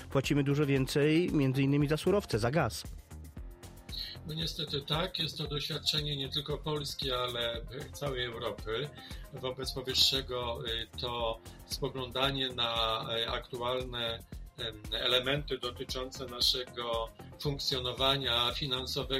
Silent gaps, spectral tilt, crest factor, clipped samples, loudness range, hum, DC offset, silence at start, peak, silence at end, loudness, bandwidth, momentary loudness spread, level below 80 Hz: none; -4.5 dB/octave; 22 dB; under 0.1%; 4 LU; none; under 0.1%; 0 s; -12 dBFS; 0 s; -32 LUFS; 16 kHz; 13 LU; -48 dBFS